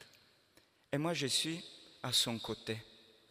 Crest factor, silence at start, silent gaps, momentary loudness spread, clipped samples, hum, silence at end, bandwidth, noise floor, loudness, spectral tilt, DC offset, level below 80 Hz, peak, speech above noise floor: 20 dB; 0 s; none; 13 LU; under 0.1%; none; 0.35 s; 15.5 kHz; -69 dBFS; -36 LUFS; -3 dB/octave; under 0.1%; -72 dBFS; -18 dBFS; 33 dB